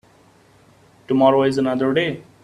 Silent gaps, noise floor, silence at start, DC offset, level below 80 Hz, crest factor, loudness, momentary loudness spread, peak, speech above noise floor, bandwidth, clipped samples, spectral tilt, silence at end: none; -53 dBFS; 1.1 s; under 0.1%; -58 dBFS; 18 dB; -18 LUFS; 8 LU; -2 dBFS; 35 dB; 11 kHz; under 0.1%; -6.5 dB/octave; 0.2 s